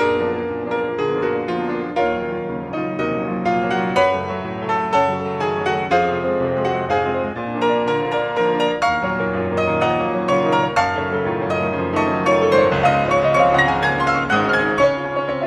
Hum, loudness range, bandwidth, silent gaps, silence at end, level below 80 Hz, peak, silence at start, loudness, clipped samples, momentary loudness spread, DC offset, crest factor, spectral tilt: none; 5 LU; 11 kHz; none; 0 s; -46 dBFS; -2 dBFS; 0 s; -19 LUFS; under 0.1%; 7 LU; under 0.1%; 16 dB; -6 dB/octave